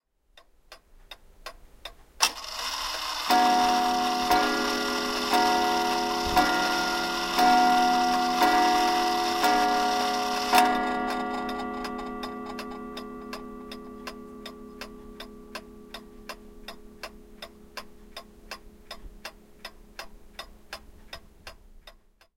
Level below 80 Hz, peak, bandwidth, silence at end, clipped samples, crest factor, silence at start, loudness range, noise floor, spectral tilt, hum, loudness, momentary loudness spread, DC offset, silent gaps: -50 dBFS; -4 dBFS; 16.5 kHz; 0.45 s; under 0.1%; 22 dB; 0.7 s; 21 LU; -59 dBFS; -2 dB/octave; none; -25 LUFS; 23 LU; under 0.1%; none